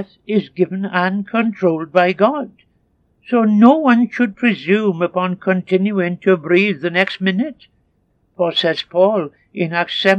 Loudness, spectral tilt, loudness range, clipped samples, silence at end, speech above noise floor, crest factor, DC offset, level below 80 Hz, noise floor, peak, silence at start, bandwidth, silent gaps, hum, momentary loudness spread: -16 LUFS; -7 dB/octave; 3 LU; under 0.1%; 0 s; 46 dB; 16 dB; under 0.1%; -66 dBFS; -62 dBFS; 0 dBFS; 0 s; 7.8 kHz; none; none; 7 LU